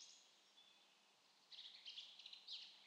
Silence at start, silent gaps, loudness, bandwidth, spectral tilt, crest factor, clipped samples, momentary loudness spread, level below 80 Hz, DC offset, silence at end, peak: 0 s; none; -57 LUFS; 10 kHz; 2 dB/octave; 20 dB; under 0.1%; 15 LU; under -90 dBFS; under 0.1%; 0 s; -42 dBFS